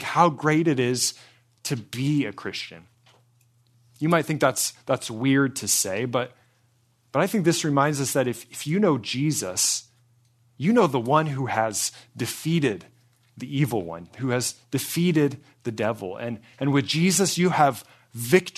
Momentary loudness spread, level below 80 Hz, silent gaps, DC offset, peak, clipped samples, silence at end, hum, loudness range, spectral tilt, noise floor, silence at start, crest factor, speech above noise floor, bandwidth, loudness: 12 LU; -68 dBFS; none; under 0.1%; -2 dBFS; under 0.1%; 0.05 s; none; 4 LU; -4.5 dB/octave; -64 dBFS; 0 s; 22 dB; 41 dB; 14 kHz; -24 LUFS